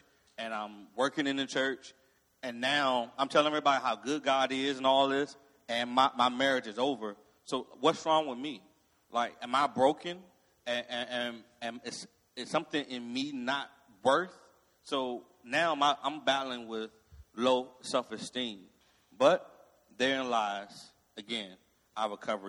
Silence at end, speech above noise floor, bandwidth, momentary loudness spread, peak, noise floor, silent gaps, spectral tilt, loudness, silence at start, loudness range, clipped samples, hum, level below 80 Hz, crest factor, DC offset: 0 s; 33 dB; 12.5 kHz; 16 LU; -10 dBFS; -65 dBFS; none; -3.5 dB/octave; -32 LUFS; 0.4 s; 5 LU; under 0.1%; none; -74 dBFS; 22 dB; under 0.1%